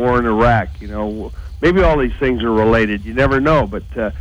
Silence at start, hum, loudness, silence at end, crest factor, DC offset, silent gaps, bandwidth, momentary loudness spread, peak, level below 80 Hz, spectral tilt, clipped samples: 0 s; none; -16 LUFS; 0 s; 14 dB; under 0.1%; none; over 20 kHz; 11 LU; 0 dBFS; -26 dBFS; -8 dB/octave; under 0.1%